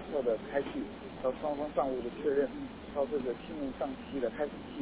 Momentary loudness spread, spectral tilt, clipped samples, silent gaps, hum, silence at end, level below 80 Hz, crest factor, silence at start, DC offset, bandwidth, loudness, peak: 7 LU; -5 dB/octave; under 0.1%; none; none; 0 s; -58 dBFS; 18 dB; 0 s; under 0.1%; 4 kHz; -35 LUFS; -16 dBFS